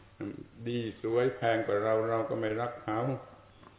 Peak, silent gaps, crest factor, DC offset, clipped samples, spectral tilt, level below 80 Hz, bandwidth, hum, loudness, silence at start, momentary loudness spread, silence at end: -16 dBFS; none; 16 dB; under 0.1%; under 0.1%; -5.5 dB/octave; -64 dBFS; 4 kHz; none; -32 LUFS; 0 s; 13 LU; 0.15 s